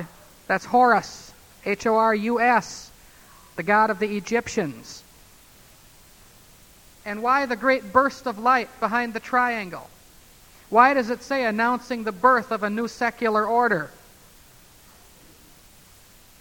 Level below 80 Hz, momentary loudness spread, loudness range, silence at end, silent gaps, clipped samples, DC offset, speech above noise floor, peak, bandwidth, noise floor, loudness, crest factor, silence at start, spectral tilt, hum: -58 dBFS; 19 LU; 6 LU; 2.5 s; none; under 0.1%; under 0.1%; 29 dB; -2 dBFS; 19.5 kHz; -51 dBFS; -22 LUFS; 22 dB; 0 s; -4.5 dB/octave; none